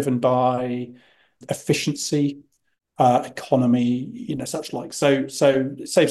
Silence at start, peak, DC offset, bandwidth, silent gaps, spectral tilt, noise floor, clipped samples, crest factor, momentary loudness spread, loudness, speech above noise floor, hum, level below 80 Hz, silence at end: 0 s; -4 dBFS; under 0.1%; 12.5 kHz; none; -5.5 dB/octave; -71 dBFS; under 0.1%; 18 dB; 11 LU; -22 LUFS; 50 dB; none; -64 dBFS; 0 s